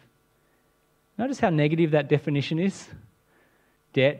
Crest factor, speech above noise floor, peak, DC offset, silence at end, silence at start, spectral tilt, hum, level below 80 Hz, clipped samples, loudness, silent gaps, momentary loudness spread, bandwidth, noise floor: 20 dB; 43 dB; -8 dBFS; under 0.1%; 0 s; 1.2 s; -7 dB/octave; none; -66 dBFS; under 0.1%; -25 LUFS; none; 18 LU; 9.4 kHz; -66 dBFS